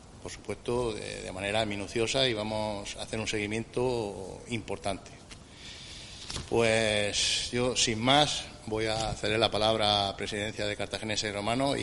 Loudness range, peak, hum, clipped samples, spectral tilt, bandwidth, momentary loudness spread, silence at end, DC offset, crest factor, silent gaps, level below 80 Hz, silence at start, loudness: 8 LU; -8 dBFS; none; under 0.1%; -3.5 dB/octave; 11.5 kHz; 17 LU; 0 s; under 0.1%; 22 dB; none; -50 dBFS; 0 s; -29 LUFS